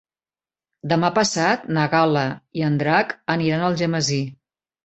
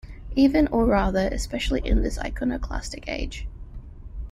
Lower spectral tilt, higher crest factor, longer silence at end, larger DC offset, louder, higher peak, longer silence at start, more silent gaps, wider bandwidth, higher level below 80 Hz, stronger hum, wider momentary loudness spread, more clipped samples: about the same, -5 dB/octave vs -6 dB/octave; about the same, 18 dB vs 18 dB; first, 0.5 s vs 0 s; neither; first, -20 LUFS vs -24 LUFS; first, -2 dBFS vs -8 dBFS; first, 0.85 s vs 0.05 s; neither; second, 8.2 kHz vs 13 kHz; second, -60 dBFS vs -30 dBFS; neither; second, 7 LU vs 20 LU; neither